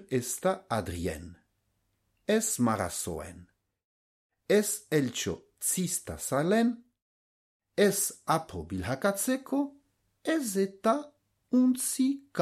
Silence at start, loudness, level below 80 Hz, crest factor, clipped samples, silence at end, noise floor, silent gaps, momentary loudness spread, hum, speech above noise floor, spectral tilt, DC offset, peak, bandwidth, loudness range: 0 s; -29 LUFS; -58 dBFS; 20 dB; under 0.1%; 0 s; -76 dBFS; 3.84-4.30 s, 7.02-7.60 s; 11 LU; none; 47 dB; -4.5 dB/octave; under 0.1%; -12 dBFS; 15.5 kHz; 3 LU